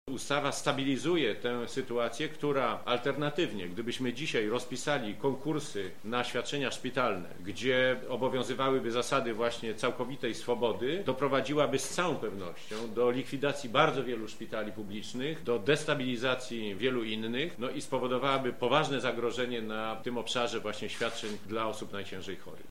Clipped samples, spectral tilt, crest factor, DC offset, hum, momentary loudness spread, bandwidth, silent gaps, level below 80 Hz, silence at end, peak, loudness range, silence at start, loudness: under 0.1%; -4.5 dB/octave; 24 dB; 0.8%; none; 9 LU; 16 kHz; none; -66 dBFS; 0.05 s; -8 dBFS; 2 LU; 0.05 s; -32 LUFS